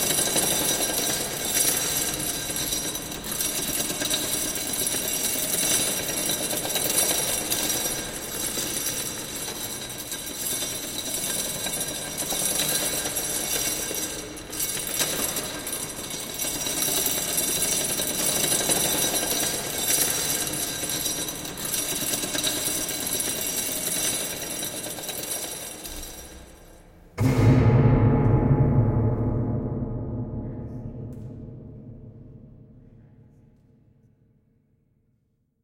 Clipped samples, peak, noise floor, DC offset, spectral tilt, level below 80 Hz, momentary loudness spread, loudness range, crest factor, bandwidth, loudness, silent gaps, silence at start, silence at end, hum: under 0.1%; -8 dBFS; -70 dBFS; under 0.1%; -3 dB/octave; -42 dBFS; 11 LU; 7 LU; 20 dB; 17 kHz; -24 LUFS; none; 0 s; 2.6 s; none